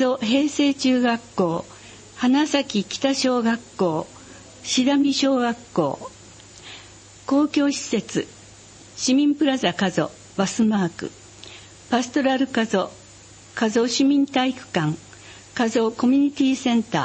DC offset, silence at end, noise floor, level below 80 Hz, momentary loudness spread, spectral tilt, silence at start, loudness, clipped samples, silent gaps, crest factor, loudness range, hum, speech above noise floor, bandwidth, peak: under 0.1%; 0 s; -46 dBFS; -60 dBFS; 20 LU; -4.5 dB/octave; 0 s; -21 LUFS; under 0.1%; none; 16 dB; 3 LU; none; 25 dB; 8.8 kHz; -6 dBFS